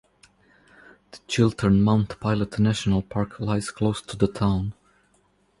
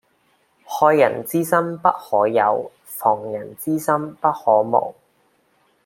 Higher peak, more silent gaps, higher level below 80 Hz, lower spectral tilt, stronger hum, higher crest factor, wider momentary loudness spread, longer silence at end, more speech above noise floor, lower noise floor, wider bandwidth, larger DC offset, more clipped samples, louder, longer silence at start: second, -6 dBFS vs -2 dBFS; neither; first, -44 dBFS vs -68 dBFS; about the same, -6.5 dB/octave vs -6 dB/octave; neither; about the same, 20 dB vs 18 dB; about the same, 8 LU vs 10 LU; about the same, 0.9 s vs 0.95 s; about the same, 41 dB vs 44 dB; about the same, -64 dBFS vs -62 dBFS; second, 11.5 kHz vs 16.5 kHz; neither; neither; second, -24 LUFS vs -19 LUFS; first, 1.15 s vs 0.7 s